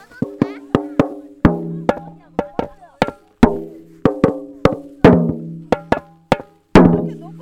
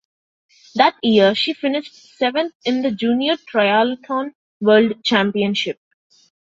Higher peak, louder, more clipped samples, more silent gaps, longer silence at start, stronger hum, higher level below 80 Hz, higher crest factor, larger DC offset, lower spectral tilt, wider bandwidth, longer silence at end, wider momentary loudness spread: about the same, 0 dBFS vs -2 dBFS; about the same, -18 LUFS vs -18 LUFS; first, 0.3% vs under 0.1%; second, none vs 2.55-2.60 s, 4.35-4.60 s; second, 0.2 s vs 0.75 s; neither; first, -34 dBFS vs -64 dBFS; about the same, 18 dB vs 18 dB; neither; first, -8 dB/octave vs -5.5 dB/octave; first, 11 kHz vs 7.8 kHz; second, 0 s vs 0.75 s; first, 15 LU vs 10 LU